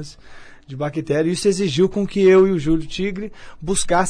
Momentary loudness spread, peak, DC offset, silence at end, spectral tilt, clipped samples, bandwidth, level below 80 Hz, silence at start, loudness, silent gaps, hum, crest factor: 19 LU; -6 dBFS; under 0.1%; 0 s; -5 dB/octave; under 0.1%; 10.5 kHz; -38 dBFS; 0 s; -18 LUFS; none; none; 14 dB